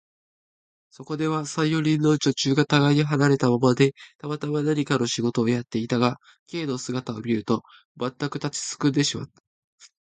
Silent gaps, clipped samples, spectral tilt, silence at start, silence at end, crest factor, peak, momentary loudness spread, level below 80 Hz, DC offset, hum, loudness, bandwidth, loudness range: 4.15-4.19 s, 6.39-6.46 s, 7.85-7.95 s, 9.40-9.78 s; under 0.1%; -5.5 dB/octave; 1 s; 0.2 s; 20 dB; -4 dBFS; 12 LU; -64 dBFS; under 0.1%; none; -24 LUFS; 9.4 kHz; 6 LU